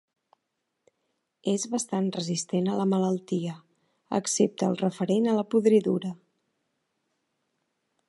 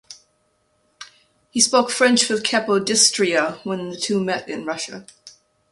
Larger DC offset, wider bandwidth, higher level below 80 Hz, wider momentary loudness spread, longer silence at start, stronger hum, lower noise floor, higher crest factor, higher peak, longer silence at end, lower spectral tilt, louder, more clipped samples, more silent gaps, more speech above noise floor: neither; about the same, 11.5 kHz vs 11.5 kHz; second, -78 dBFS vs -66 dBFS; second, 10 LU vs 13 LU; first, 1.45 s vs 0.1 s; neither; first, -81 dBFS vs -66 dBFS; about the same, 18 dB vs 20 dB; second, -10 dBFS vs -2 dBFS; first, 1.95 s vs 0.4 s; first, -5.5 dB/octave vs -2 dB/octave; second, -27 LUFS vs -19 LUFS; neither; neither; first, 55 dB vs 46 dB